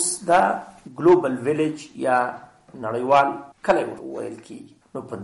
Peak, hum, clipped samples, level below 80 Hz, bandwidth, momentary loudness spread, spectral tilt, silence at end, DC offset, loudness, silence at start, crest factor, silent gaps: -6 dBFS; none; under 0.1%; -60 dBFS; 11.5 kHz; 20 LU; -4.5 dB/octave; 0 s; under 0.1%; -21 LUFS; 0 s; 16 dB; none